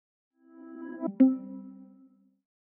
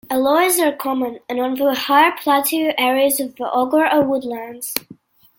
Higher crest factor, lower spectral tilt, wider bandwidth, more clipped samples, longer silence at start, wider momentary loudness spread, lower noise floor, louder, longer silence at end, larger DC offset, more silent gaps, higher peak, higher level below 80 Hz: about the same, 22 dB vs 18 dB; first, -7 dB/octave vs -2 dB/octave; second, 2.8 kHz vs 17 kHz; neither; first, 0.6 s vs 0.1 s; first, 23 LU vs 10 LU; first, -61 dBFS vs -46 dBFS; second, -27 LUFS vs -17 LUFS; first, 0.9 s vs 0.45 s; neither; neither; second, -10 dBFS vs 0 dBFS; second, under -90 dBFS vs -64 dBFS